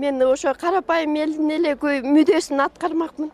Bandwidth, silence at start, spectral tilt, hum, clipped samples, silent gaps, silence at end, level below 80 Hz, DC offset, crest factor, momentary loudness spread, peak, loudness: 12 kHz; 0 s; -3.5 dB/octave; none; under 0.1%; none; 0 s; -58 dBFS; under 0.1%; 14 dB; 6 LU; -6 dBFS; -20 LUFS